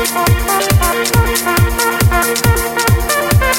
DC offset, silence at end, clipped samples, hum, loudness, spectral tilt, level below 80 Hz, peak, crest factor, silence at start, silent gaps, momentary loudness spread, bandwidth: under 0.1%; 0 s; under 0.1%; none; -13 LUFS; -4 dB/octave; -22 dBFS; 0 dBFS; 12 dB; 0 s; none; 1 LU; 17.5 kHz